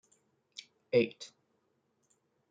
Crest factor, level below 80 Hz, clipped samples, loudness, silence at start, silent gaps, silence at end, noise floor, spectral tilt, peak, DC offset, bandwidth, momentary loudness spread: 24 dB; -82 dBFS; under 0.1%; -32 LUFS; 0.95 s; none; 1.25 s; -77 dBFS; -5.5 dB/octave; -14 dBFS; under 0.1%; 8.8 kHz; 20 LU